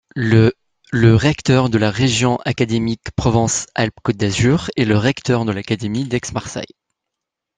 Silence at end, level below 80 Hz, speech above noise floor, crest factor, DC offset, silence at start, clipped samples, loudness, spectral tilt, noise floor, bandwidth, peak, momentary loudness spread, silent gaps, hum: 0.9 s; -42 dBFS; 65 dB; 16 dB; under 0.1%; 0.15 s; under 0.1%; -17 LUFS; -5.5 dB/octave; -82 dBFS; 9.6 kHz; -2 dBFS; 8 LU; none; none